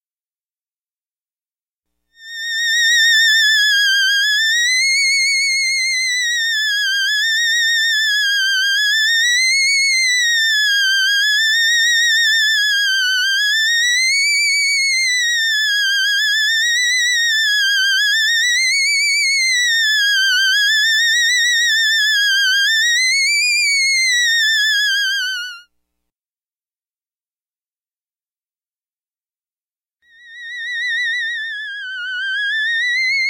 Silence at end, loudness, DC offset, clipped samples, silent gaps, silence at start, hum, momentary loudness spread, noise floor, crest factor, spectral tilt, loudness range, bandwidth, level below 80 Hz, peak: 0 s; -13 LUFS; under 0.1%; under 0.1%; 26.18-26.22 s, 26.90-27.01 s, 28.01-28.06 s; 2.2 s; none; 6 LU; under -90 dBFS; 12 dB; 9.5 dB/octave; 8 LU; 16 kHz; -86 dBFS; -4 dBFS